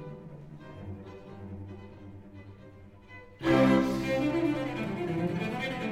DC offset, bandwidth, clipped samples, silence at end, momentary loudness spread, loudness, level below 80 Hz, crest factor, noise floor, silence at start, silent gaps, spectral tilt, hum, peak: under 0.1%; 15.5 kHz; under 0.1%; 0 s; 25 LU; -29 LUFS; -56 dBFS; 20 dB; -51 dBFS; 0 s; none; -7 dB/octave; none; -12 dBFS